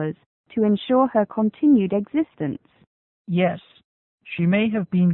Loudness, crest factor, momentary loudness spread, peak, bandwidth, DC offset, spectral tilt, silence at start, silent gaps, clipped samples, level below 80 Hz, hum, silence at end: -21 LUFS; 14 dB; 14 LU; -6 dBFS; 4.1 kHz; under 0.1%; -12.5 dB/octave; 0 s; 0.26-0.44 s, 2.87-3.25 s, 3.84-4.18 s; under 0.1%; -62 dBFS; none; 0 s